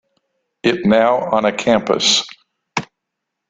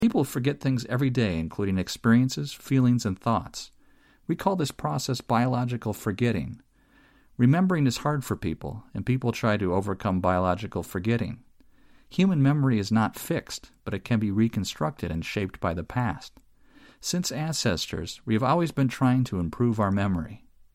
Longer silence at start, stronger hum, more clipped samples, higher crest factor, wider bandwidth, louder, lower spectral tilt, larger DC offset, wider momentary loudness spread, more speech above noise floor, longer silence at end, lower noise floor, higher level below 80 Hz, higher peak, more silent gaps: first, 0.65 s vs 0 s; neither; neither; about the same, 16 dB vs 18 dB; second, 9.4 kHz vs 16 kHz; first, -16 LUFS vs -26 LUFS; second, -3.5 dB/octave vs -6 dB/octave; neither; about the same, 12 LU vs 12 LU; first, 63 dB vs 34 dB; first, 0.65 s vs 0.35 s; first, -78 dBFS vs -59 dBFS; second, -56 dBFS vs -50 dBFS; first, -2 dBFS vs -8 dBFS; neither